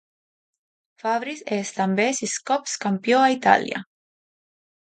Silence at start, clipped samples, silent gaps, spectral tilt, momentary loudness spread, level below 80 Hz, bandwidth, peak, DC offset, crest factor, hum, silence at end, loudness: 1.05 s; under 0.1%; none; -3.5 dB/octave; 10 LU; -74 dBFS; 9.4 kHz; -2 dBFS; under 0.1%; 22 dB; none; 1 s; -22 LUFS